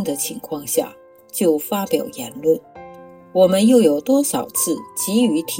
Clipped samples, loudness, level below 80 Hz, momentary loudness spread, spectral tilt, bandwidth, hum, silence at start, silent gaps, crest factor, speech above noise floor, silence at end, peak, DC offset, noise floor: under 0.1%; -18 LUFS; -62 dBFS; 12 LU; -4.5 dB/octave; 17 kHz; none; 0 s; none; 16 dB; 22 dB; 0 s; -2 dBFS; under 0.1%; -40 dBFS